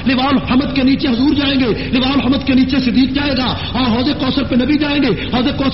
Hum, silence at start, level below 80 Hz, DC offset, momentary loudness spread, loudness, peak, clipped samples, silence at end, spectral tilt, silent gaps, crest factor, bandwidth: none; 0 s; -32 dBFS; 2%; 3 LU; -14 LUFS; -2 dBFS; under 0.1%; 0 s; -4 dB/octave; none; 12 dB; 5.8 kHz